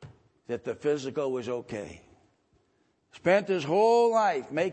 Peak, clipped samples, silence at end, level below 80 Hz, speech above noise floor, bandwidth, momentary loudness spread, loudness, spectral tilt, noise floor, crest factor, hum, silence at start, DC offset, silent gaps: -8 dBFS; under 0.1%; 0 s; -68 dBFS; 44 dB; 8.8 kHz; 16 LU; -27 LUFS; -5.5 dB/octave; -71 dBFS; 20 dB; none; 0 s; under 0.1%; none